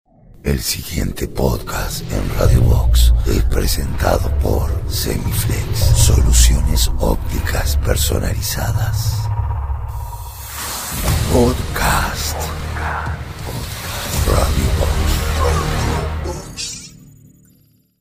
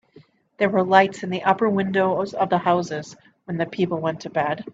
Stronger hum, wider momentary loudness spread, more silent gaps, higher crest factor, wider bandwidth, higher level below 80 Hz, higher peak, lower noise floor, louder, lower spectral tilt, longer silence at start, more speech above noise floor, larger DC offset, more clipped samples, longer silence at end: neither; about the same, 11 LU vs 11 LU; neither; second, 16 dB vs 22 dB; first, 16 kHz vs 7.8 kHz; first, -20 dBFS vs -66 dBFS; about the same, 0 dBFS vs 0 dBFS; about the same, -54 dBFS vs -53 dBFS; first, -18 LUFS vs -22 LUFS; second, -4.5 dB/octave vs -6.5 dB/octave; second, 0.3 s vs 0.6 s; first, 39 dB vs 32 dB; neither; neither; first, 1.05 s vs 0.05 s